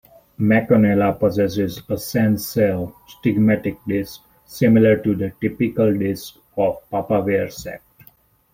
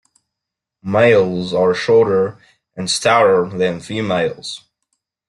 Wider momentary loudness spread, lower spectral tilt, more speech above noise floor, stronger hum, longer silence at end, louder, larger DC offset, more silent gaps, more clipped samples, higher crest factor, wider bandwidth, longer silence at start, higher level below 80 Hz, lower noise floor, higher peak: about the same, 14 LU vs 16 LU; first, -7 dB/octave vs -4.5 dB/octave; second, 35 dB vs 67 dB; neither; about the same, 0.75 s vs 0.7 s; second, -19 LUFS vs -16 LUFS; neither; neither; neither; about the same, 16 dB vs 16 dB; first, 16.5 kHz vs 11.5 kHz; second, 0.4 s vs 0.85 s; about the same, -52 dBFS vs -56 dBFS; second, -54 dBFS vs -82 dBFS; about the same, -2 dBFS vs -2 dBFS